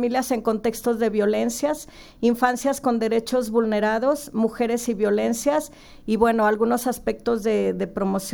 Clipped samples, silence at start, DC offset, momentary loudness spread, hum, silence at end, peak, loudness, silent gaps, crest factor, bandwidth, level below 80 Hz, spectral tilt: under 0.1%; 0 s; under 0.1%; 6 LU; none; 0 s; -6 dBFS; -23 LUFS; none; 16 dB; over 20 kHz; -50 dBFS; -5 dB/octave